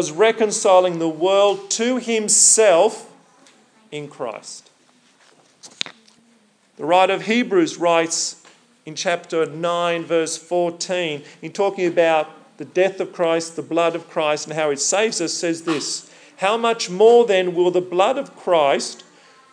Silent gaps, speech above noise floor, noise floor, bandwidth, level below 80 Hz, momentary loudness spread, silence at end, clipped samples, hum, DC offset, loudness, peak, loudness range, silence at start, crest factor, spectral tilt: none; 39 dB; -57 dBFS; 10.5 kHz; under -90 dBFS; 15 LU; 0.6 s; under 0.1%; none; under 0.1%; -18 LUFS; -2 dBFS; 7 LU; 0 s; 18 dB; -2.5 dB/octave